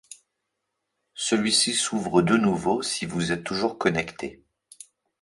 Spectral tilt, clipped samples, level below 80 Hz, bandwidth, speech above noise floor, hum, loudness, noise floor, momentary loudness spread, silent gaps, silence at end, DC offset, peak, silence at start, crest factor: -3.5 dB/octave; under 0.1%; -58 dBFS; 11.5 kHz; 56 dB; none; -24 LUFS; -80 dBFS; 12 LU; none; 0.9 s; under 0.1%; -6 dBFS; 0.1 s; 20 dB